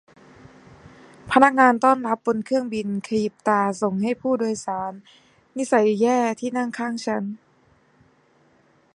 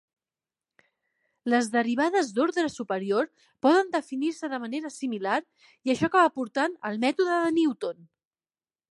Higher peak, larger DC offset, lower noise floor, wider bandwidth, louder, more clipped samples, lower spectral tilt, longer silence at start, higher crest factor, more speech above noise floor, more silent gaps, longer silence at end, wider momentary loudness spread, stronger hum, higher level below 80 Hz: first, 0 dBFS vs -8 dBFS; neither; second, -59 dBFS vs under -90 dBFS; about the same, 11.5 kHz vs 11.5 kHz; first, -21 LUFS vs -26 LUFS; neither; about the same, -5.5 dB/octave vs -4.5 dB/octave; second, 1.25 s vs 1.45 s; about the same, 22 dB vs 20 dB; second, 38 dB vs over 64 dB; neither; first, 1.6 s vs 1 s; about the same, 12 LU vs 11 LU; neither; first, -64 dBFS vs -70 dBFS